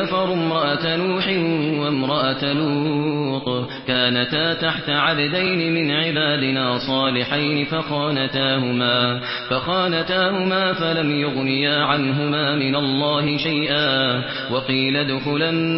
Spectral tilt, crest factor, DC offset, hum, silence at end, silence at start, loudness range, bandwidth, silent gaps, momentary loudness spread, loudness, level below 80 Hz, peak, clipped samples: -10 dB/octave; 16 dB; under 0.1%; none; 0 s; 0 s; 1 LU; 5.8 kHz; none; 4 LU; -20 LUFS; -58 dBFS; -4 dBFS; under 0.1%